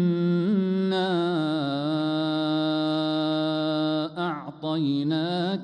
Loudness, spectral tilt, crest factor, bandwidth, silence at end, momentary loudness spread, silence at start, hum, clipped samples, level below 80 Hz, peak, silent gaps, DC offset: -25 LUFS; -8 dB/octave; 10 dB; 9.6 kHz; 0 s; 4 LU; 0 s; none; under 0.1%; -72 dBFS; -14 dBFS; none; under 0.1%